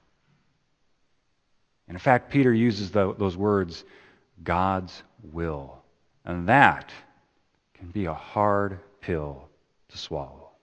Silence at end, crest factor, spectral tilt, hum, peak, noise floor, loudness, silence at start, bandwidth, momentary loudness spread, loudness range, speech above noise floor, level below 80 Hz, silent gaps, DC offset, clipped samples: 0.2 s; 26 dB; -7 dB/octave; none; 0 dBFS; -69 dBFS; -25 LUFS; 1.9 s; 8.6 kHz; 22 LU; 6 LU; 45 dB; -52 dBFS; none; under 0.1%; under 0.1%